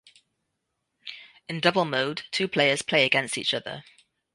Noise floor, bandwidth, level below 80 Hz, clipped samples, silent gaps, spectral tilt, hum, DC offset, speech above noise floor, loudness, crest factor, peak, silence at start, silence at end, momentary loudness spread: -80 dBFS; 11.5 kHz; -70 dBFS; under 0.1%; none; -3.5 dB/octave; none; under 0.1%; 54 dB; -24 LUFS; 22 dB; -6 dBFS; 1.05 s; 0.55 s; 20 LU